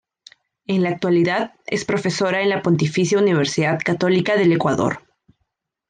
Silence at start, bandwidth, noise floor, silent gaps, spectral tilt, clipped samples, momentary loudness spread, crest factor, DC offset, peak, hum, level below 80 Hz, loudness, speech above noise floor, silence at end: 0.7 s; 9.6 kHz; -74 dBFS; none; -5.5 dB/octave; under 0.1%; 7 LU; 14 dB; under 0.1%; -6 dBFS; none; -60 dBFS; -19 LUFS; 56 dB; 0.9 s